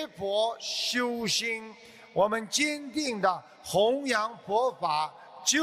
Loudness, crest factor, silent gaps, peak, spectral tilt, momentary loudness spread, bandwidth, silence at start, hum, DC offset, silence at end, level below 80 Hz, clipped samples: -28 LUFS; 18 dB; none; -12 dBFS; -2 dB/octave; 6 LU; 15 kHz; 0 s; none; under 0.1%; 0 s; -68 dBFS; under 0.1%